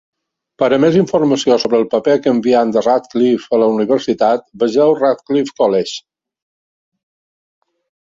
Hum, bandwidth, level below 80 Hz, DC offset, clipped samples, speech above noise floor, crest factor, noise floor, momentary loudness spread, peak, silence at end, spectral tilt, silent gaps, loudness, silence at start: none; 7.8 kHz; -58 dBFS; under 0.1%; under 0.1%; over 77 dB; 14 dB; under -90 dBFS; 5 LU; -2 dBFS; 2.1 s; -6 dB/octave; none; -14 LUFS; 0.6 s